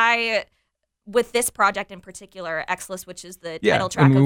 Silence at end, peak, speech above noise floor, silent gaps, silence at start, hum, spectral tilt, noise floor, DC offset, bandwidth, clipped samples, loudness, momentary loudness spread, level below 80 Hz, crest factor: 0 s; -2 dBFS; 52 dB; none; 0 s; none; -5 dB/octave; -74 dBFS; under 0.1%; 17 kHz; under 0.1%; -22 LUFS; 19 LU; -58 dBFS; 20 dB